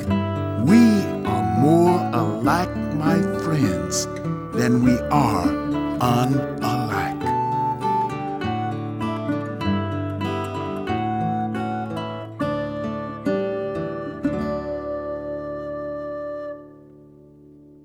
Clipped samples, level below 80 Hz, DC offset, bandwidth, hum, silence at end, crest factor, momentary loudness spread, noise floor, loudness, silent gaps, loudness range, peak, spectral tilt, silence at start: under 0.1%; -46 dBFS; under 0.1%; 19 kHz; none; 0.25 s; 18 dB; 12 LU; -47 dBFS; -23 LUFS; none; 8 LU; -4 dBFS; -6.5 dB/octave; 0 s